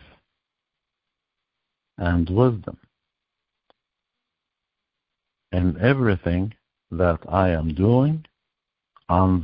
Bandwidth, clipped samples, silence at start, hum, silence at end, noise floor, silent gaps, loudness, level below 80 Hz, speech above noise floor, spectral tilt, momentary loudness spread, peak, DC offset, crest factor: 5.2 kHz; under 0.1%; 2 s; none; 0 s; -84 dBFS; none; -22 LUFS; -36 dBFS; 64 dB; -12.5 dB/octave; 11 LU; -4 dBFS; under 0.1%; 20 dB